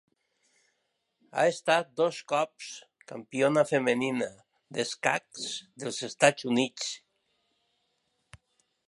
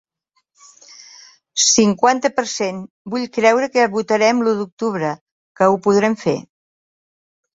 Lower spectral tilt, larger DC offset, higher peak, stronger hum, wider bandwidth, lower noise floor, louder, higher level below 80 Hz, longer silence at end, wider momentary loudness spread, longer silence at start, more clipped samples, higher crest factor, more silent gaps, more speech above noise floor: about the same, -3.5 dB/octave vs -3 dB/octave; neither; second, -4 dBFS vs 0 dBFS; neither; first, 11.5 kHz vs 7.8 kHz; first, -78 dBFS vs -69 dBFS; second, -29 LUFS vs -17 LUFS; second, -76 dBFS vs -60 dBFS; first, 1.9 s vs 1.1 s; first, 15 LU vs 12 LU; second, 1.35 s vs 1.55 s; neither; first, 26 dB vs 18 dB; second, none vs 2.90-3.05 s, 4.72-4.77 s, 5.21-5.26 s, 5.32-5.55 s; about the same, 50 dB vs 52 dB